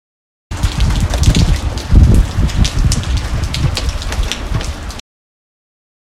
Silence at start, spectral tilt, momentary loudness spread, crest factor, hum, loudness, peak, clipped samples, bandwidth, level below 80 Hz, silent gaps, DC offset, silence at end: 0.5 s; -5 dB/octave; 11 LU; 14 dB; none; -15 LUFS; 0 dBFS; 0.3%; 14.5 kHz; -16 dBFS; none; under 0.1%; 1 s